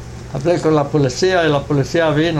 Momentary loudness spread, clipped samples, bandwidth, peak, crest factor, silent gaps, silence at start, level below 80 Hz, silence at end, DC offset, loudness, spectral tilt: 4 LU; under 0.1%; 12 kHz; -4 dBFS; 12 dB; none; 0 s; -38 dBFS; 0 s; under 0.1%; -16 LUFS; -6 dB/octave